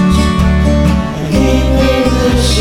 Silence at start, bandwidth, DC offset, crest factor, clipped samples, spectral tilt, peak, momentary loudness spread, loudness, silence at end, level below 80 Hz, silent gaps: 0 s; 15.5 kHz; under 0.1%; 10 dB; under 0.1%; -6 dB/octave; 0 dBFS; 2 LU; -11 LUFS; 0 s; -16 dBFS; none